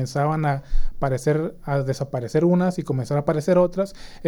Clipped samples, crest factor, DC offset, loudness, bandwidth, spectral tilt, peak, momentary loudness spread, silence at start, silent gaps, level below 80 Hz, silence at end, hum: under 0.1%; 14 dB; under 0.1%; -23 LUFS; 12.5 kHz; -7.5 dB/octave; -6 dBFS; 8 LU; 0 s; none; -30 dBFS; 0 s; none